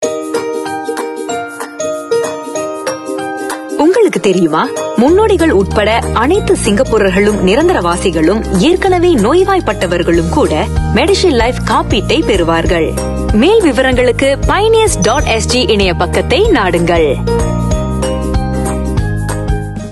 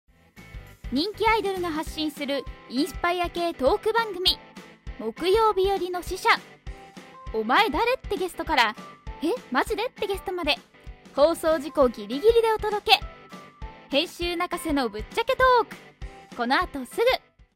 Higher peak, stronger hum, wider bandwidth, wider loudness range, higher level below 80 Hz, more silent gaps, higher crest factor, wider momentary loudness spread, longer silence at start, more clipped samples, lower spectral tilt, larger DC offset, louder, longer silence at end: about the same, -2 dBFS vs -2 dBFS; neither; second, 12.5 kHz vs 16 kHz; about the same, 4 LU vs 3 LU; first, -22 dBFS vs -44 dBFS; neither; second, 10 dB vs 22 dB; second, 10 LU vs 22 LU; second, 0 s vs 0.35 s; neither; about the same, -5 dB/octave vs -4 dB/octave; neither; first, -12 LUFS vs -24 LUFS; second, 0 s vs 0.35 s